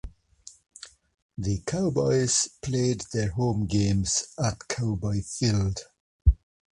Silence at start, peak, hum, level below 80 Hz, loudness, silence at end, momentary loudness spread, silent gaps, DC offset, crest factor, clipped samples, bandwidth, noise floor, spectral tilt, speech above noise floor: 0.05 s; -8 dBFS; none; -36 dBFS; -27 LUFS; 0.45 s; 16 LU; 1.22-1.29 s, 6.00-6.19 s; under 0.1%; 20 dB; under 0.1%; 11.5 kHz; -52 dBFS; -5 dB/octave; 26 dB